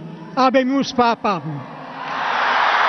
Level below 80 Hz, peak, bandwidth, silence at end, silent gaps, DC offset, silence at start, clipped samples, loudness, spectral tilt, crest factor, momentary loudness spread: -58 dBFS; -4 dBFS; 6.4 kHz; 0 s; none; under 0.1%; 0 s; under 0.1%; -18 LUFS; -5 dB/octave; 16 dB; 14 LU